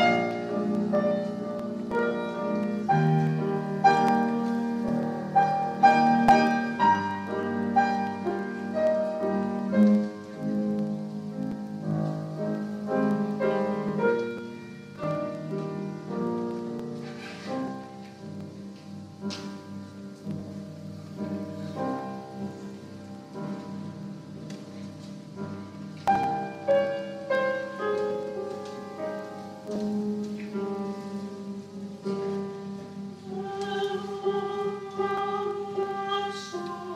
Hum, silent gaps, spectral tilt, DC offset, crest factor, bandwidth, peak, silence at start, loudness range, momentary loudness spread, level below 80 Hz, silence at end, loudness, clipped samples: none; none; -7 dB/octave; under 0.1%; 22 dB; 11.5 kHz; -6 dBFS; 0 s; 14 LU; 17 LU; -66 dBFS; 0 s; -28 LUFS; under 0.1%